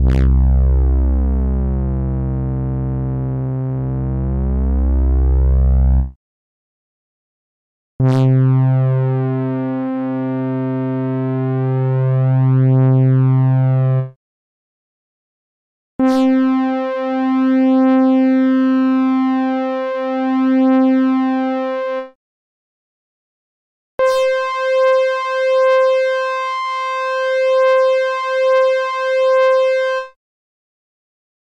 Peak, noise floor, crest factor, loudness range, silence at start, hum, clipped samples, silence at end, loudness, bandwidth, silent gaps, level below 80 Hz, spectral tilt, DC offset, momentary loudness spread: -6 dBFS; under -90 dBFS; 10 dB; 5 LU; 0 s; none; under 0.1%; 1.3 s; -16 LUFS; 7.4 kHz; 6.16-7.99 s, 14.16-15.99 s, 22.15-23.98 s; -22 dBFS; -8.5 dB/octave; under 0.1%; 8 LU